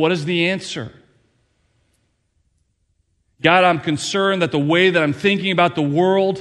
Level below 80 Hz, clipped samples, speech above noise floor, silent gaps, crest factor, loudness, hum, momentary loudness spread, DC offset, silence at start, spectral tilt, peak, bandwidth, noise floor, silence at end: -60 dBFS; under 0.1%; 49 dB; none; 18 dB; -17 LUFS; none; 7 LU; under 0.1%; 0 s; -5 dB/octave; 0 dBFS; 11.5 kHz; -66 dBFS; 0 s